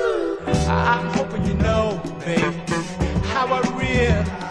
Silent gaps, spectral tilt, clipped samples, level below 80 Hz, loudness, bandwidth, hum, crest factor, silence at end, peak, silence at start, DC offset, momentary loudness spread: none; -6 dB/octave; under 0.1%; -32 dBFS; -21 LUFS; 11 kHz; none; 16 dB; 0 s; -6 dBFS; 0 s; under 0.1%; 5 LU